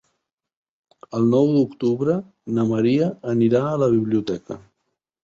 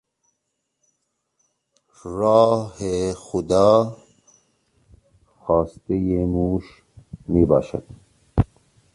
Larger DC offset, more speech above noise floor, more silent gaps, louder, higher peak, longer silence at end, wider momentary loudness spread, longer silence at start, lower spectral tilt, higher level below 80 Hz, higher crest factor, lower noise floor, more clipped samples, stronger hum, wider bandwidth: neither; about the same, 57 dB vs 57 dB; neither; about the same, -21 LUFS vs -21 LUFS; second, -6 dBFS vs -2 dBFS; first, 0.65 s vs 0.5 s; second, 12 LU vs 16 LU; second, 1.1 s vs 2.05 s; about the same, -8.5 dB/octave vs -7.5 dB/octave; second, -60 dBFS vs -40 dBFS; about the same, 16 dB vs 20 dB; about the same, -77 dBFS vs -76 dBFS; neither; neither; second, 7.4 kHz vs 11 kHz